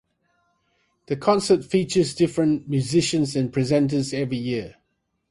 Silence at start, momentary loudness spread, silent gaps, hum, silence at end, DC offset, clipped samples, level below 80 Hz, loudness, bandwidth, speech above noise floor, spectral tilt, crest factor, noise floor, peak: 1.1 s; 7 LU; none; none; 0.6 s; under 0.1%; under 0.1%; -56 dBFS; -22 LUFS; 11.5 kHz; 52 dB; -6 dB/octave; 18 dB; -74 dBFS; -4 dBFS